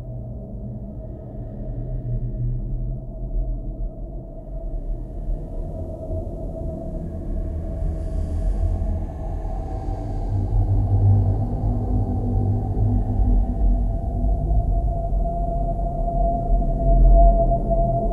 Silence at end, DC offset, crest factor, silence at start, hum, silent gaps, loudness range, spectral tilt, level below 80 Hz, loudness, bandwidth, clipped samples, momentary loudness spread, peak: 0 s; under 0.1%; 18 dB; 0 s; none; none; 10 LU; -11.5 dB/octave; -22 dBFS; -25 LUFS; 1.8 kHz; under 0.1%; 14 LU; -4 dBFS